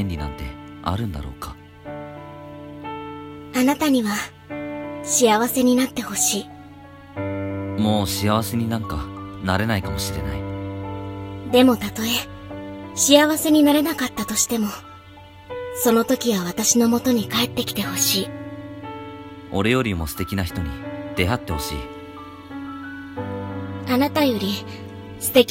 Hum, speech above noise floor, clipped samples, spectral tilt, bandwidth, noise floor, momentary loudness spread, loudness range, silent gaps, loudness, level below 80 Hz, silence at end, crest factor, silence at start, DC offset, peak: none; 23 dB; under 0.1%; -4 dB/octave; 16.5 kHz; -43 dBFS; 19 LU; 7 LU; none; -21 LUFS; -42 dBFS; 0 s; 22 dB; 0 s; under 0.1%; 0 dBFS